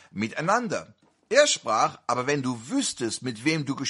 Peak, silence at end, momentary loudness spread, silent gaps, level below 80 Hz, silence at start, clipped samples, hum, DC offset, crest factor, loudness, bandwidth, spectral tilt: -4 dBFS; 0 s; 9 LU; none; -70 dBFS; 0.15 s; under 0.1%; none; under 0.1%; 22 dB; -25 LUFS; 11.5 kHz; -3.5 dB/octave